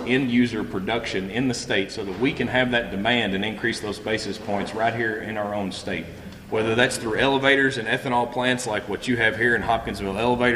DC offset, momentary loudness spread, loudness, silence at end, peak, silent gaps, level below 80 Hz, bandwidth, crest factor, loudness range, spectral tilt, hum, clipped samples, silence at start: under 0.1%; 8 LU; -23 LUFS; 0 s; -4 dBFS; none; -48 dBFS; 14.5 kHz; 20 dB; 4 LU; -4.5 dB/octave; none; under 0.1%; 0 s